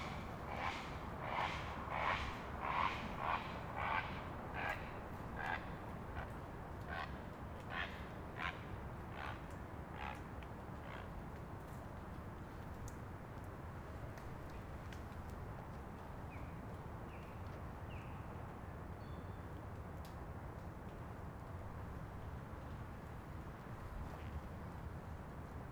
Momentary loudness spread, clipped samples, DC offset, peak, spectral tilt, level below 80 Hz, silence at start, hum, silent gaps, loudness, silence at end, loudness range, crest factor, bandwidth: 10 LU; under 0.1%; under 0.1%; -24 dBFS; -6 dB/octave; -54 dBFS; 0 s; none; none; -47 LUFS; 0 s; 9 LU; 22 dB; over 20 kHz